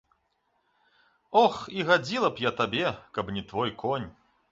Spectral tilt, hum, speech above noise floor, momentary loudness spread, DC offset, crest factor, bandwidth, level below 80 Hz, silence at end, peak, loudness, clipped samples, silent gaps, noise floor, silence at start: -5 dB/octave; none; 47 dB; 10 LU; under 0.1%; 22 dB; 7.8 kHz; -60 dBFS; 0.4 s; -8 dBFS; -27 LUFS; under 0.1%; none; -73 dBFS; 1.3 s